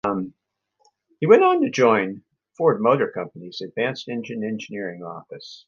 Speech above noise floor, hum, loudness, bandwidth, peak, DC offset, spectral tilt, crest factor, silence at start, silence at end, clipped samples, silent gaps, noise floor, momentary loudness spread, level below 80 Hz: 44 dB; none; -21 LUFS; 7 kHz; 0 dBFS; under 0.1%; -6 dB/octave; 22 dB; 0.05 s; 0.1 s; under 0.1%; none; -65 dBFS; 20 LU; -68 dBFS